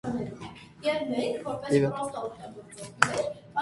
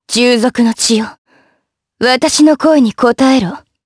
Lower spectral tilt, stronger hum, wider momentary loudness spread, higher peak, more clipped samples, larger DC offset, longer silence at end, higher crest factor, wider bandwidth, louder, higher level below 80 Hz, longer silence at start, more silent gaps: first, -5 dB/octave vs -3.5 dB/octave; neither; first, 18 LU vs 7 LU; about the same, 0 dBFS vs 0 dBFS; neither; neither; second, 0 s vs 0.25 s; first, 30 dB vs 12 dB; about the same, 11.5 kHz vs 11 kHz; second, -29 LUFS vs -11 LUFS; second, -62 dBFS vs -50 dBFS; about the same, 0.05 s vs 0.1 s; second, none vs 1.18-1.25 s